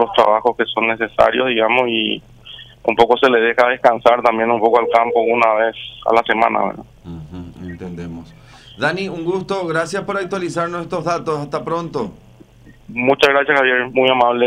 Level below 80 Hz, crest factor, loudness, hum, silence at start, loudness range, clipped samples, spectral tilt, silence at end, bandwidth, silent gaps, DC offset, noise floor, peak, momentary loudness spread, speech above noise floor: -50 dBFS; 16 dB; -16 LUFS; none; 0 s; 8 LU; under 0.1%; -5 dB/octave; 0 s; 13.5 kHz; none; under 0.1%; -44 dBFS; 0 dBFS; 18 LU; 28 dB